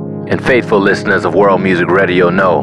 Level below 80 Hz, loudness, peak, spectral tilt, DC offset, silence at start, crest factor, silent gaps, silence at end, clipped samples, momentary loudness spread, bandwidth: -44 dBFS; -11 LUFS; 0 dBFS; -7 dB/octave; 0.3%; 0 s; 10 dB; none; 0 s; under 0.1%; 2 LU; 11 kHz